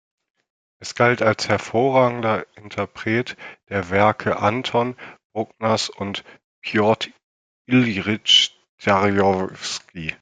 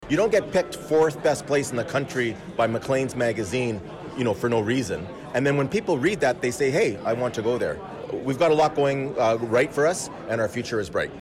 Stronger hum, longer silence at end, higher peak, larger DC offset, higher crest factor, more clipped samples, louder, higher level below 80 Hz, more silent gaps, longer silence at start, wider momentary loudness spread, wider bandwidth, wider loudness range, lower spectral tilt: neither; about the same, 0.05 s vs 0 s; first, -2 dBFS vs -12 dBFS; neither; first, 20 dB vs 12 dB; neither; first, -20 LUFS vs -24 LUFS; second, -60 dBFS vs -54 dBFS; first, 5.25-5.30 s, 6.44-6.62 s, 7.23-7.65 s, 8.69-8.78 s vs none; first, 0.8 s vs 0 s; first, 14 LU vs 8 LU; second, 9.4 kHz vs 15.5 kHz; about the same, 4 LU vs 2 LU; about the same, -4.5 dB/octave vs -5.5 dB/octave